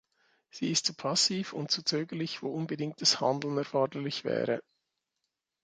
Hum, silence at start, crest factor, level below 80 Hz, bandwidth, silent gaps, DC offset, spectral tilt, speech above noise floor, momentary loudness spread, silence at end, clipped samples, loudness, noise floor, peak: none; 0.55 s; 22 dB; -78 dBFS; 11 kHz; none; under 0.1%; -3.5 dB/octave; 54 dB; 9 LU; 1.05 s; under 0.1%; -30 LUFS; -85 dBFS; -10 dBFS